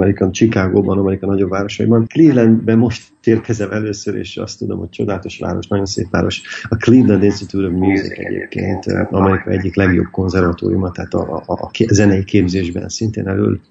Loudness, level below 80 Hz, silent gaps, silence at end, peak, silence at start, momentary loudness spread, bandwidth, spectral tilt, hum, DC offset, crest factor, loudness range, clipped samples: -16 LUFS; -42 dBFS; none; 0.1 s; 0 dBFS; 0 s; 11 LU; 8.2 kHz; -6.5 dB/octave; none; under 0.1%; 14 dB; 6 LU; under 0.1%